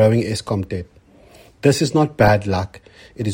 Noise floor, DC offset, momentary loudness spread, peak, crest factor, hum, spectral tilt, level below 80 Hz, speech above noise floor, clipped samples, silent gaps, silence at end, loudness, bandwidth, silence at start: -47 dBFS; under 0.1%; 14 LU; 0 dBFS; 18 dB; none; -6 dB/octave; -44 dBFS; 29 dB; under 0.1%; none; 0 s; -19 LUFS; 16.5 kHz; 0 s